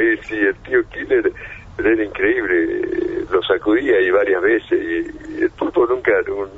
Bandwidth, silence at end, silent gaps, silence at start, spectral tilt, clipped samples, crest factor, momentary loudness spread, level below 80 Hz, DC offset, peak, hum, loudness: 7.4 kHz; 0 s; none; 0 s; -6.5 dB/octave; under 0.1%; 16 dB; 7 LU; -44 dBFS; under 0.1%; -2 dBFS; none; -18 LUFS